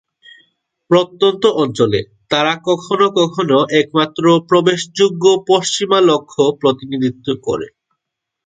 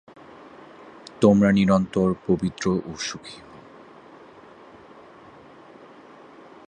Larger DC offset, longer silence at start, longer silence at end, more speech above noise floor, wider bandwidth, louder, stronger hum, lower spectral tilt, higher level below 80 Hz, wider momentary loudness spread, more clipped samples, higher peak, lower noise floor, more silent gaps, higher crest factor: neither; second, 0.9 s vs 1.2 s; second, 0.75 s vs 3.3 s; first, 65 dB vs 27 dB; about the same, 9.4 kHz vs 9.4 kHz; first, -15 LUFS vs -21 LUFS; neither; second, -4.5 dB/octave vs -6.5 dB/octave; about the same, -56 dBFS vs -54 dBFS; second, 8 LU vs 28 LU; neither; about the same, 0 dBFS vs -2 dBFS; first, -79 dBFS vs -47 dBFS; neither; second, 16 dB vs 22 dB